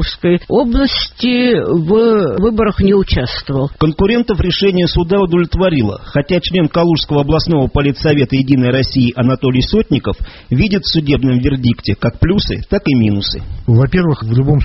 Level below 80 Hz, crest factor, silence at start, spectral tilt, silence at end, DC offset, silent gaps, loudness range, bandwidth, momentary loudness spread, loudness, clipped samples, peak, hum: -26 dBFS; 12 dB; 0 s; -6 dB/octave; 0 s; under 0.1%; none; 1 LU; 6 kHz; 5 LU; -13 LUFS; under 0.1%; 0 dBFS; none